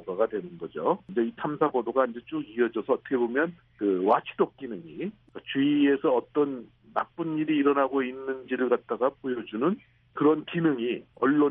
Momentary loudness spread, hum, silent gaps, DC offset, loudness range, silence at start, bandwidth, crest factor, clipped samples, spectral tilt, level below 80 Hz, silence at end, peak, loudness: 12 LU; none; none; under 0.1%; 2 LU; 0 s; 3.8 kHz; 18 dB; under 0.1%; -5 dB/octave; -70 dBFS; 0 s; -10 dBFS; -27 LUFS